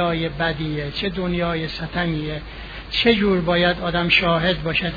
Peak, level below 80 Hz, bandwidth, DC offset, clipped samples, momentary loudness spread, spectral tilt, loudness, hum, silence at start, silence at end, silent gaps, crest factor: -4 dBFS; -38 dBFS; 5 kHz; under 0.1%; under 0.1%; 10 LU; -7 dB/octave; -20 LUFS; none; 0 s; 0 s; none; 18 dB